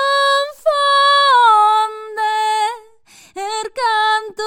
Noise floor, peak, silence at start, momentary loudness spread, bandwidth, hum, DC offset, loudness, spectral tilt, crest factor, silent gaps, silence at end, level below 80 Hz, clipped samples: -47 dBFS; -2 dBFS; 0 s; 13 LU; 16.5 kHz; none; under 0.1%; -14 LUFS; 1.5 dB/octave; 14 dB; none; 0 s; -66 dBFS; under 0.1%